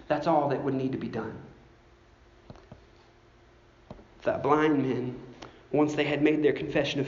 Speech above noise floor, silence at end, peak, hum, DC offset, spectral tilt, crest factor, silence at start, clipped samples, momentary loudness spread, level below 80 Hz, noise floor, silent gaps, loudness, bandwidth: 31 dB; 0 s; -8 dBFS; none; under 0.1%; -5 dB/octave; 20 dB; 0 s; under 0.1%; 16 LU; -60 dBFS; -57 dBFS; none; -27 LUFS; 7.4 kHz